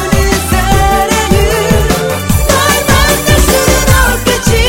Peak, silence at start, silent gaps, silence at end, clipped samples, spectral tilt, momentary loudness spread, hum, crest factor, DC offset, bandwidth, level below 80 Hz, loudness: 0 dBFS; 0 s; none; 0 s; 0.5%; -4 dB/octave; 3 LU; none; 8 dB; under 0.1%; 19 kHz; -16 dBFS; -9 LUFS